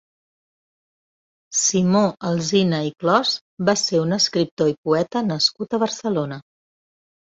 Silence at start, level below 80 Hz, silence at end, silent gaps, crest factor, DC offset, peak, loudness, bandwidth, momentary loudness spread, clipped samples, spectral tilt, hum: 1.5 s; -62 dBFS; 0.95 s; 3.41-3.57 s, 4.51-4.57 s, 4.78-4.84 s; 18 dB; under 0.1%; -4 dBFS; -20 LUFS; 8 kHz; 6 LU; under 0.1%; -4 dB/octave; none